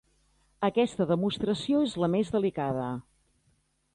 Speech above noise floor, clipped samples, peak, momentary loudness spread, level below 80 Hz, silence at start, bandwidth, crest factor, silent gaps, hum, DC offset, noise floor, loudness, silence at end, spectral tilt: 43 dB; under 0.1%; -12 dBFS; 5 LU; -60 dBFS; 0.6 s; 11.5 kHz; 16 dB; none; none; under 0.1%; -71 dBFS; -28 LUFS; 0.95 s; -6.5 dB/octave